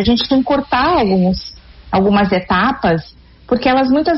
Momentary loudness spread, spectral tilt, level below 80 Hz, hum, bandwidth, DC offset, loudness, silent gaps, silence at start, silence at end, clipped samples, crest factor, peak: 7 LU; -4.5 dB/octave; -36 dBFS; none; 6 kHz; under 0.1%; -15 LUFS; none; 0 s; 0 s; under 0.1%; 12 dB; -2 dBFS